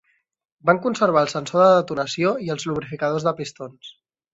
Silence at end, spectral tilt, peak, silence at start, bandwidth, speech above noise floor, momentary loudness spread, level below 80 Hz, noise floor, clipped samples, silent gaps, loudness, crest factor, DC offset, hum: 0.45 s; -5.5 dB/octave; -2 dBFS; 0.65 s; 8 kHz; 48 dB; 14 LU; -62 dBFS; -68 dBFS; under 0.1%; none; -21 LUFS; 20 dB; under 0.1%; none